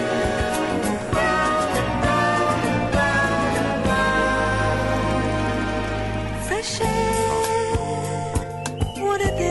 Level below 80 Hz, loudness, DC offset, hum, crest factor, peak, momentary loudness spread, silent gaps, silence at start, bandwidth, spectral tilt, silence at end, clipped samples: -34 dBFS; -22 LUFS; under 0.1%; none; 12 dB; -8 dBFS; 7 LU; none; 0 s; 12 kHz; -5 dB/octave; 0 s; under 0.1%